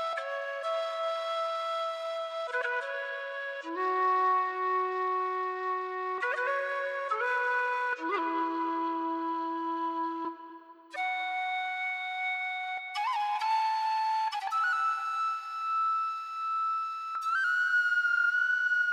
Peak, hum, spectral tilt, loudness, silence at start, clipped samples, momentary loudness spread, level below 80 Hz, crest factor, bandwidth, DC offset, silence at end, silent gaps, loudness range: -18 dBFS; none; -0.5 dB/octave; -30 LUFS; 0 s; under 0.1%; 8 LU; under -90 dBFS; 12 dB; 14 kHz; under 0.1%; 0 s; none; 4 LU